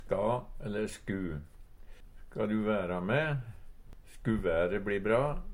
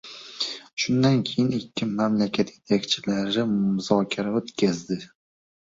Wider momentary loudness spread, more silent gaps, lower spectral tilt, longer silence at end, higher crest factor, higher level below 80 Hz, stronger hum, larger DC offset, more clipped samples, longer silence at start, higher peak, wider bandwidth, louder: about the same, 9 LU vs 8 LU; second, none vs 0.73-0.77 s; first, -7 dB/octave vs -5.5 dB/octave; second, 0 s vs 0.6 s; about the same, 18 dB vs 20 dB; first, -46 dBFS vs -62 dBFS; neither; neither; neither; about the same, 0 s vs 0.05 s; second, -16 dBFS vs -4 dBFS; first, 16 kHz vs 7.8 kHz; second, -33 LUFS vs -25 LUFS